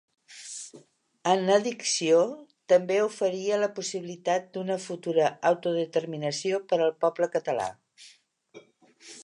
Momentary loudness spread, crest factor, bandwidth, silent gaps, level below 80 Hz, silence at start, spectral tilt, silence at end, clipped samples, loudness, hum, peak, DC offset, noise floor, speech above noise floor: 15 LU; 20 dB; 11 kHz; none; -78 dBFS; 0.3 s; -4 dB/octave; 0 s; under 0.1%; -27 LUFS; none; -8 dBFS; under 0.1%; -58 dBFS; 32 dB